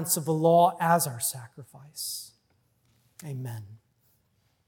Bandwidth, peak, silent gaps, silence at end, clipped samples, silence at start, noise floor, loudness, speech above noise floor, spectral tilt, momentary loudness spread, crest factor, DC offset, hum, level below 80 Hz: 18 kHz; -8 dBFS; none; 0.9 s; under 0.1%; 0 s; -70 dBFS; -26 LUFS; 44 dB; -4.5 dB/octave; 23 LU; 22 dB; under 0.1%; none; -78 dBFS